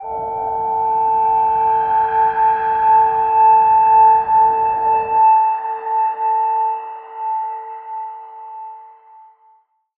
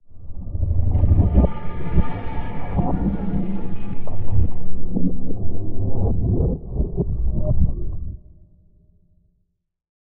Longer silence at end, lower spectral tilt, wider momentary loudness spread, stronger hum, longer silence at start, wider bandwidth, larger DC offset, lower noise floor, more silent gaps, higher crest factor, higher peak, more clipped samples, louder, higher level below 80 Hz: second, 1.1 s vs 1.95 s; second, -7.5 dB/octave vs -13 dB/octave; first, 18 LU vs 13 LU; neither; about the same, 0 s vs 0.1 s; about the same, 3.5 kHz vs 3.2 kHz; neither; second, -55 dBFS vs -68 dBFS; neither; about the same, 12 dB vs 12 dB; about the same, -4 dBFS vs -4 dBFS; neither; first, -15 LUFS vs -24 LUFS; second, -54 dBFS vs -26 dBFS